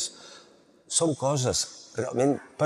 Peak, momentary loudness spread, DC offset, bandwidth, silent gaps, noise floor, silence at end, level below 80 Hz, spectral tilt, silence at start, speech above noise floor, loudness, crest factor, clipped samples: -10 dBFS; 10 LU; under 0.1%; 14.5 kHz; none; -57 dBFS; 0 s; -60 dBFS; -4 dB/octave; 0 s; 30 dB; -27 LUFS; 20 dB; under 0.1%